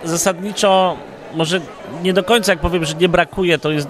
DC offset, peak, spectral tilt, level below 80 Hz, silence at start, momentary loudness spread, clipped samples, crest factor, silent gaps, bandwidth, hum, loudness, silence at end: under 0.1%; 0 dBFS; -4 dB/octave; -36 dBFS; 0 s; 8 LU; under 0.1%; 16 dB; none; 15.5 kHz; none; -16 LUFS; 0 s